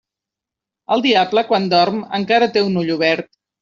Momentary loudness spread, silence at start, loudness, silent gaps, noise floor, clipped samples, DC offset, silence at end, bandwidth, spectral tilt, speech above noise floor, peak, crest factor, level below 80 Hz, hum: 5 LU; 0.9 s; -16 LUFS; none; -86 dBFS; under 0.1%; under 0.1%; 0.4 s; 7.4 kHz; -3 dB/octave; 70 dB; -2 dBFS; 16 dB; -60 dBFS; none